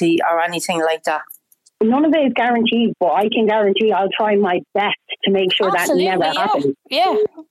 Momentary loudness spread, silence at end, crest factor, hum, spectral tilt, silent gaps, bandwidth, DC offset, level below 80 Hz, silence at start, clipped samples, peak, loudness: 5 LU; 0.1 s; 8 dB; none; -4.5 dB/octave; none; 14.5 kHz; under 0.1%; -66 dBFS; 0 s; under 0.1%; -8 dBFS; -17 LUFS